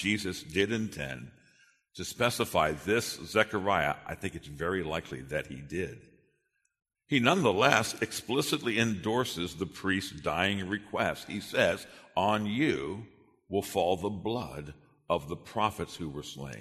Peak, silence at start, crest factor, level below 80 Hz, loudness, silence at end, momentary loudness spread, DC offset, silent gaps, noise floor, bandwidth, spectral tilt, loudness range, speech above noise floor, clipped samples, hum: -4 dBFS; 0 s; 26 dB; -58 dBFS; -31 LUFS; 0 s; 12 LU; under 0.1%; none; -77 dBFS; 13.5 kHz; -4.5 dB/octave; 5 LU; 46 dB; under 0.1%; none